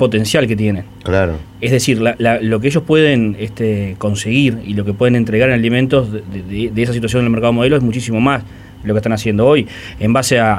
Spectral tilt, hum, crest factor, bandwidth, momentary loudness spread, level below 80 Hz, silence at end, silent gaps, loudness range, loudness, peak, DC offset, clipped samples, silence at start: -6 dB/octave; none; 14 dB; 16 kHz; 8 LU; -38 dBFS; 0 s; none; 1 LU; -15 LUFS; 0 dBFS; under 0.1%; under 0.1%; 0 s